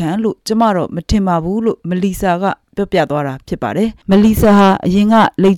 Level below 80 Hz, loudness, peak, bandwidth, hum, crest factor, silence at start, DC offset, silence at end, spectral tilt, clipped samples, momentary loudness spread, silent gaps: -32 dBFS; -14 LUFS; -4 dBFS; 17 kHz; none; 10 dB; 0 s; under 0.1%; 0 s; -6.5 dB/octave; under 0.1%; 10 LU; none